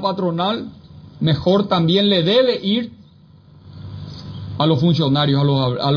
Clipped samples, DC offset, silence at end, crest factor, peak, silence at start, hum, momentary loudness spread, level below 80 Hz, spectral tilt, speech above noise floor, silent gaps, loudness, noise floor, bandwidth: under 0.1%; under 0.1%; 0 s; 16 dB; -2 dBFS; 0 s; none; 18 LU; -50 dBFS; -8 dB/octave; 30 dB; none; -17 LUFS; -47 dBFS; 5.4 kHz